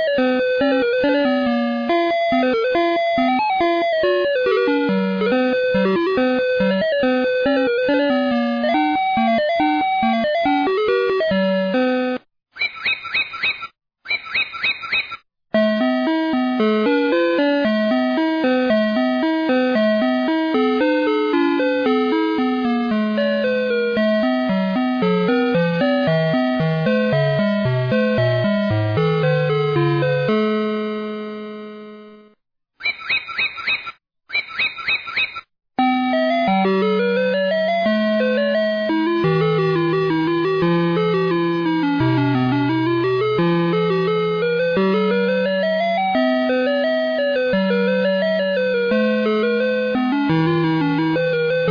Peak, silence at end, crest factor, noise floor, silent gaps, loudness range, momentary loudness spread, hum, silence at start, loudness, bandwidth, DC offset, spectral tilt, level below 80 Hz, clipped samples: -10 dBFS; 0 s; 8 dB; -63 dBFS; none; 3 LU; 4 LU; none; 0 s; -18 LUFS; 5.4 kHz; under 0.1%; -8 dB/octave; -56 dBFS; under 0.1%